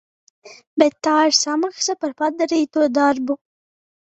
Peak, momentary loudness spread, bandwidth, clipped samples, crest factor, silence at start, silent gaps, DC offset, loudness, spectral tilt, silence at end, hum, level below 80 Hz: -2 dBFS; 8 LU; 8.2 kHz; under 0.1%; 18 dB; 0.45 s; 0.67-0.77 s; under 0.1%; -19 LUFS; -1.5 dB/octave; 0.8 s; none; -68 dBFS